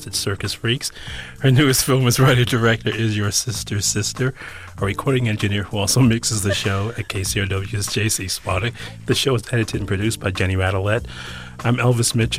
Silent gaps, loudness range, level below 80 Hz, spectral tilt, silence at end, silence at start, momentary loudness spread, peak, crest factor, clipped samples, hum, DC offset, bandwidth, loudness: none; 4 LU; -42 dBFS; -4.5 dB/octave; 0 s; 0 s; 10 LU; -6 dBFS; 14 dB; under 0.1%; none; under 0.1%; 15.5 kHz; -19 LUFS